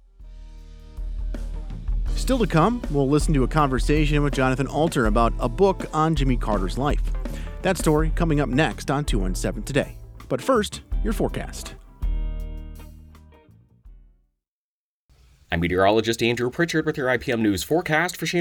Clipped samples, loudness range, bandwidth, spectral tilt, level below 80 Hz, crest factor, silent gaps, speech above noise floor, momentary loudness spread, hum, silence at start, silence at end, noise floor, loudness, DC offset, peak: under 0.1%; 11 LU; 19 kHz; -5.5 dB/octave; -30 dBFS; 20 dB; 14.48-15.09 s; over 69 dB; 14 LU; none; 0.2 s; 0 s; under -90 dBFS; -23 LUFS; under 0.1%; -4 dBFS